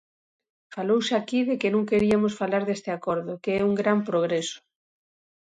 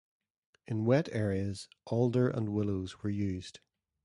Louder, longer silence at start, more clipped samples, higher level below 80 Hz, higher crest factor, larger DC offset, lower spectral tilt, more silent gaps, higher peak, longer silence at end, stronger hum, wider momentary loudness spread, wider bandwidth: first, -25 LUFS vs -33 LUFS; about the same, 0.7 s vs 0.7 s; neither; second, -62 dBFS vs -56 dBFS; about the same, 18 dB vs 18 dB; neither; second, -5.5 dB/octave vs -7.5 dB/octave; neither; first, -8 dBFS vs -14 dBFS; first, 0.85 s vs 0.5 s; neither; second, 7 LU vs 10 LU; second, 9.4 kHz vs 11.5 kHz